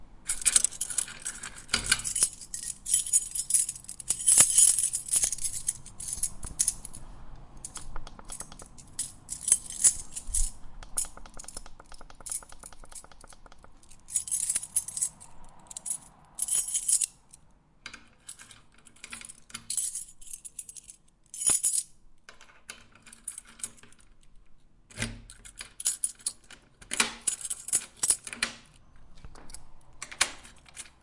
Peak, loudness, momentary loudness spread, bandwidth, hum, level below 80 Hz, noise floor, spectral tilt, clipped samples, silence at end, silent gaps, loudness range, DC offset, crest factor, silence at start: -2 dBFS; -26 LUFS; 24 LU; 11.5 kHz; none; -48 dBFS; -59 dBFS; 0.5 dB/octave; under 0.1%; 0.15 s; none; 15 LU; under 0.1%; 30 dB; 0 s